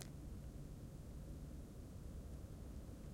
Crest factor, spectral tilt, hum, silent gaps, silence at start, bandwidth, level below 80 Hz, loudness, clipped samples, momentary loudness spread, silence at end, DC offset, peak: 22 dB; -6.5 dB/octave; none; none; 0 s; 16 kHz; -56 dBFS; -54 LUFS; under 0.1%; 1 LU; 0 s; under 0.1%; -30 dBFS